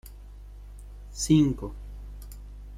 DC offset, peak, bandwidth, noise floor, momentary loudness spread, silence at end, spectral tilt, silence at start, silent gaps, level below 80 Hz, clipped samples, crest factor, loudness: under 0.1%; -10 dBFS; 15.5 kHz; -44 dBFS; 26 LU; 0 s; -6 dB/octave; 0.05 s; none; -42 dBFS; under 0.1%; 20 dB; -25 LUFS